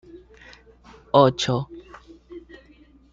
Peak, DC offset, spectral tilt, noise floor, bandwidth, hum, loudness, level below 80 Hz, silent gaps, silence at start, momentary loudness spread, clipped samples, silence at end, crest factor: -2 dBFS; under 0.1%; -5.5 dB/octave; -53 dBFS; 7.8 kHz; none; -20 LUFS; -54 dBFS; none; 0.15 s; 26 LU; under 0.1%; 0.75 s; 24 dB